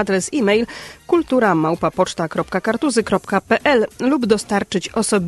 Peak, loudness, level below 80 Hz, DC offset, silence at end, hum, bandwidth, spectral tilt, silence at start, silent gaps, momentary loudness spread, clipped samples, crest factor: -2 dBFS; -18 LUFS; -50 dBFS; under 0.1%; 0 s; none; 12.5 kHz; -4.5 dB/octave; 0 s; none; 6 LU; under 0.1%; 16 dB